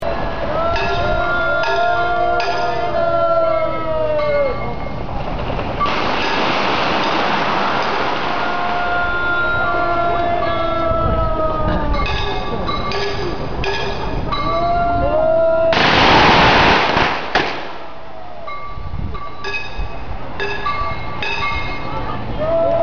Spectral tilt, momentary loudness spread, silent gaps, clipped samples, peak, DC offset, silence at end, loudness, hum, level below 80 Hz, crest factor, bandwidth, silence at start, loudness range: -2.5 dB/octave; 13 LU; none; under 0.1%; -4 dBFS; 6%; 0 s; -17 LUFS; none; -30 dBFS; 14 dB; 7 kHz; 0 s; 10 LU